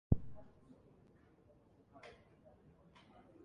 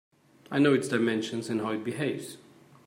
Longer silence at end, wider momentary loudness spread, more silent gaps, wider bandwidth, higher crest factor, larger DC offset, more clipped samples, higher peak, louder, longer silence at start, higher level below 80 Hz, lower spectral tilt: first, 1.3 s vs 0.5 s; first, 19 LU vs 9 LU; neither; second, 6.2 kHz vs 16 kHz; first, 32 dB vs 18 dB; neither; neither; about the same, -14 dBFS vs -12 dBFS; second, -45 LUFS vs -28 LUFS; second, 0.1 s vs 0.5 s; first, -52 dBFS vs -76 dBFS; first, -9.5 dB/octave vs -5.5 dB/octave